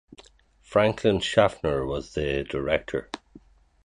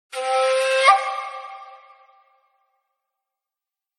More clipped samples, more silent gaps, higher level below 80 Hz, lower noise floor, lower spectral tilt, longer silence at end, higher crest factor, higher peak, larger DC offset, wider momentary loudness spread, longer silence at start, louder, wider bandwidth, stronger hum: neither; neither; first, -46 dBFS vs under -90 dBFS; second, -57 dBFS vs -88 dBFS; first, -5.5 dB/octave vs 5 dB/octave; second, 0.45 s vs 2.25 s; about the same, 22 dB vs 22 dB; about the same, -4 dBFS vs -2 dBFS; neither; second, 11 LU vs 22 LU; first, 0.7 s vs 0.15 s; second, -25 LUFS vs -19 LUFS; second, 10.5 kHz vs 12.5 kHz; neither